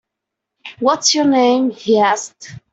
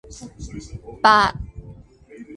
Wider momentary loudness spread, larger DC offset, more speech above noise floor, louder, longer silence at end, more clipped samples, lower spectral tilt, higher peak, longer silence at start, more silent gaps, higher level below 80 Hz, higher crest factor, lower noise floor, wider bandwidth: second, 7 LU vs 23 LU; neither; first, 65 dB vs 24 dB; about the same, -15 LUFS vs -17 LUFS; first, 0.15 s vs 0 s; neither; second, -2.5 dB/octave vs -4 dB/octave; about the same, -2 dBFS vs 0 dBFS; first, 0.65 s vs 0.1 s; neither; second, -62 dBFS vs -42 dBFS; second, 14 dB vs 22 dB; first, -80 dBFS vs -44 dBFS; second, 8.2 kHz vs 11.5 kHz